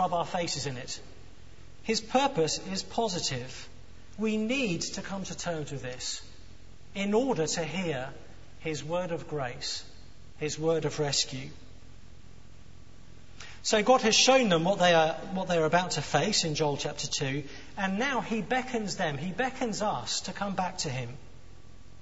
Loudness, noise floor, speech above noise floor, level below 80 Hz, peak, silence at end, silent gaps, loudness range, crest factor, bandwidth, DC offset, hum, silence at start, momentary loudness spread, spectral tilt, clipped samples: -29 LUFS; -52 dBFS; 23 dB; -56 dBFS; -8 dBFS; 0.1 s; none; 9 LU; 22 dB; 8.2 kHz; 0.7%; none; 0 s; 15 LU; -3.5 dB/octave; under 0.1%